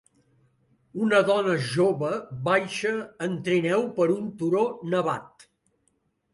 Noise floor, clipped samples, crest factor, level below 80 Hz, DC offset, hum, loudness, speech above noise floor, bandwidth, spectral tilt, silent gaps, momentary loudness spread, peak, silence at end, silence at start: -71 dBFS; under 0.1%; 18 dB; -68 dBFS; under 0.1%; none; -25 LUFS; 47 dB; 11.5 kHz; -6 dB/octave; none; 8 LU; -8 dBFS; 1.05 s; 0.95 s